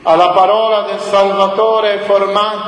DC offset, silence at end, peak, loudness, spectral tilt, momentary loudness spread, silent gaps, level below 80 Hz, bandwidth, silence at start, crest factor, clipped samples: under 0.1%; 0 s; 0 dBFS; -12 LUFS; -4.5 dB/octave; 5 LU; none; -56 dBFS; 10.5 kHz; 0.05 s; 12 dB; under 0.1%